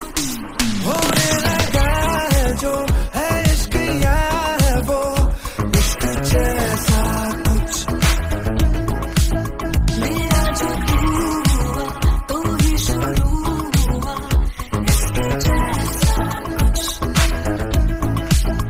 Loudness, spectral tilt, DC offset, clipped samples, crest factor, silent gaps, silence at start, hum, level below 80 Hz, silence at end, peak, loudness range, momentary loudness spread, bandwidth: -19 LUFS; -4.5 dB/octave; under 0.1%; under 0.1%; 14 dB; none; 0 s; none; -20 dBFS; 0 s; -2 dBFS; 2 LU; 4 LU; 16 kHz